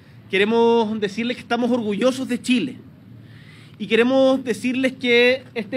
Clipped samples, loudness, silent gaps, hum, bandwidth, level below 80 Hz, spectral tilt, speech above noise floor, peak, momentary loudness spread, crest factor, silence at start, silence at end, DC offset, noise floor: under 0.1%; -20 LUFS; none; none; 13.5 kHz; -66 dBFS; -5 dB/octave; 24 dB; -4 dBFS; 9 LU; 16 dB; 0.15 s; 0 s; under 0.1%; -43 dBFS